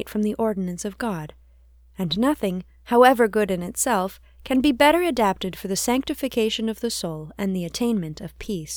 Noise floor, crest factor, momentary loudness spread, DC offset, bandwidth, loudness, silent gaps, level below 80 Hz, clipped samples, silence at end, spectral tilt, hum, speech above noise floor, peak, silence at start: -52 dBFS; 22 dB; 14 LU; under 0.1%; over 20 kHz; -22 LUFS; none; -48 dBFS; under 0.1%; 0 s; -4.5 dB/octave; none; 30 dB; -2 dBFS; 0 s